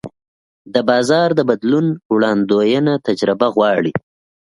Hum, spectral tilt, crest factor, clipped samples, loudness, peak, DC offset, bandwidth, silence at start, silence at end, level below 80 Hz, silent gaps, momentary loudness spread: none; -6 dB/octave; 16 dB; under 0.1%; -16 LUFS; 0 dBFS; under 0.1%; 11.5 kHz; 0.05 s; 0.4 s; -58 dBFS; 0.28-0.65 s, 2.05-2.10 s; 5 LU